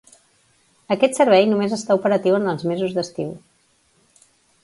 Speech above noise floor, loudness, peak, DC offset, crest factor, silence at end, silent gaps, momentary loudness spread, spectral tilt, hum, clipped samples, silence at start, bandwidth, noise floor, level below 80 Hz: 43 dB; -19 LUFS; -2 dBFS; under 0.1%; 20 dB; 1.25 s; none; 14 LU; -5.5 dB/octave; none; under 0.1%; 0.9 s; 11.5 kHz; -61 dBFS; -66 dBFS